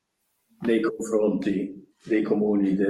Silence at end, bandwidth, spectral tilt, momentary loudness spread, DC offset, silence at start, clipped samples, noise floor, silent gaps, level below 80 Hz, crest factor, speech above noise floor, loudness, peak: 0 s; 12.5 kHz; -7 dB/octave; 9 LU; under 0.1%; 0.6 s; under 0.1%; -74 dBFS; none; -64 dBFS; 14 dB; 51 dB; -25 LUFS; -10 dBFS